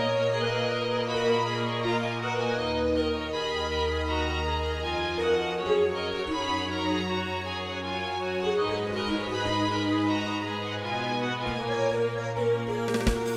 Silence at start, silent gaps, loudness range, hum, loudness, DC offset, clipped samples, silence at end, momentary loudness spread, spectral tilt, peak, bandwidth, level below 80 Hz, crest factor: 0 s; none; 1 LU; none; -28 LUFS; under 0.1%; under 0.1%; 0 s; 4 LU; -5 dB/octave; -10 dBFS; 14 kHz; -42 dBFS; 18 dB